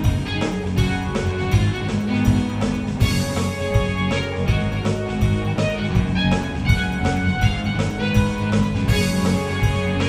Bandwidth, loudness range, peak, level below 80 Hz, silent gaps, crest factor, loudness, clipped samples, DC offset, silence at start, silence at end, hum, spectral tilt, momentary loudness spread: 15.5 kHz; 1 LU; -2 dBFS; -30 dBFS; none; 16 dB; -21 LUFS; under 0.1%; under 0.1%; 0 s; 0 s; none; -6 dB/octave; 3 LU